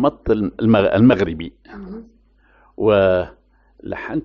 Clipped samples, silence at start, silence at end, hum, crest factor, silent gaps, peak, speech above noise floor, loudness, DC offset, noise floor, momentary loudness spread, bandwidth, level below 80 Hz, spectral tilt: under 0.1%; 0 s; 0 s; none; 16 dB; none; -2 dBFS; 37 dB; -17 LUFS; under 0.1%; -54 dBFS; 22 LU; 6.2 kHz; -42 dBFS; -6 dB/octave